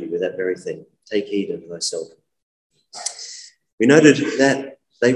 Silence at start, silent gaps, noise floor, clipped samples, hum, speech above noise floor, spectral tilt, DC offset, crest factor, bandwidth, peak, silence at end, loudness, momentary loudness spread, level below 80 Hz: 0 s; 2.42-2.70 s, 3.73-3.78 s; -40 dBFS; under 0.1%; none; 22 dB; -4.5 dB/octave; under 0.1%; 20 dB; 11.5 kHz; 0 dBFS; 0 s; -19 LUFS; 23 LU; -68 dBFS